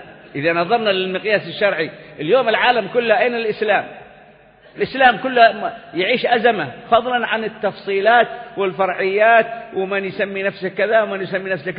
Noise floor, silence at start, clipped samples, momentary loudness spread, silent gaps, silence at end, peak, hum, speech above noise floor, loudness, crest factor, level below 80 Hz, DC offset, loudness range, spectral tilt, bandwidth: -47 dBFS; 0 s; under 0.1%; 10 LU; none; 0 s; 0 dBFS; none; 29 dB; -17 LUFS; 18 dB; -58 dBFS; under 0.1%; 2 LU; -9.5 dB/octave; 5.2 kHz